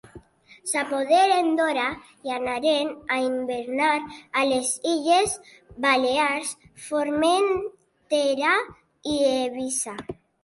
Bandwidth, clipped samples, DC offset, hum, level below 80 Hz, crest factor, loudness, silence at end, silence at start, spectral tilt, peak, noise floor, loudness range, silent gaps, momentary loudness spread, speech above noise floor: 12 kHz; under 0.1%; under 0.1%; none; -60 dBFS; 16 dB; -23 LUFS; 0.3 s; 0.15 s; -2 dB/octave; -8 dBFS; -50 dBFS; 2 LU; none; 12 LU; 26 dB